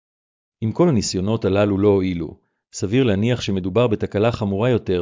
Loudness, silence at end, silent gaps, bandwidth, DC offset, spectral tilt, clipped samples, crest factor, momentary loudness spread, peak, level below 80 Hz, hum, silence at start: -20 LUFS; 0 s; none; 7.6 kHz; under 0.1%; -6.5 dB/octave; under 0.1%; 14 dB; 10 LU; -6 dBFS; -42 dBFS; none; 0.6 s